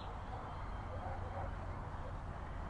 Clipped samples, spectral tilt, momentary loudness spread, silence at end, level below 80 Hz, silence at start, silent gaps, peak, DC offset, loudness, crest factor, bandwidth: under 0.1%; -7.5 dB/octave; 2 LU; 0 s; -48 dBFS; 0 s; none; -30 dBFS; under 0.1%; -46 LUFS; 12 dB; 10.5 kHz